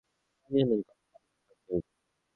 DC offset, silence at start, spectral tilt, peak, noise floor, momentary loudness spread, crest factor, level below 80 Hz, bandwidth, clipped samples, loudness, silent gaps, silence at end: under 0.1%; 0.5 s; -10 dB/octave; -14 dBFS; -79 dBFS; 18 LU; 22 dB; -62 dBFS; 4.3 kHz; under 0.1%; -31 LUFS; none; 0.55 s